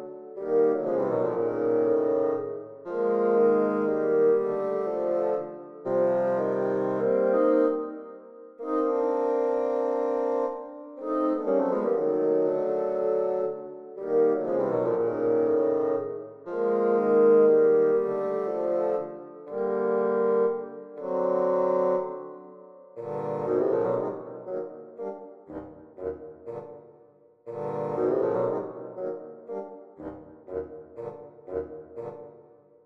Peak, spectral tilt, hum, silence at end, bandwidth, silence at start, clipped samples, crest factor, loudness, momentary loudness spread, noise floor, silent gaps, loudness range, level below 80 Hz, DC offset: -10 dBFS; -9.5 dB/octave; none; 0.45 s; 4 kHz; 0 s; under 0.1%; 16 dB; -26 LUFS; 18 LU; -57 dBFS; none; 11 LU; -68 dBFS; under 0.1%